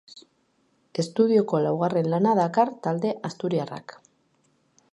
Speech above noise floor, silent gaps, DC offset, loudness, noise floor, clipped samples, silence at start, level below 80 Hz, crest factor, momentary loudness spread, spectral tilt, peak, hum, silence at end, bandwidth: 44 dB; none; under 0.1%; -24 LUFS; -68 dBFS; under 0.1%; 0.15 s; -74 dBFS; 18 dB; 10 LU; -7 dB/octave; -8 dBFS; none; 1 s; 11.5 kHz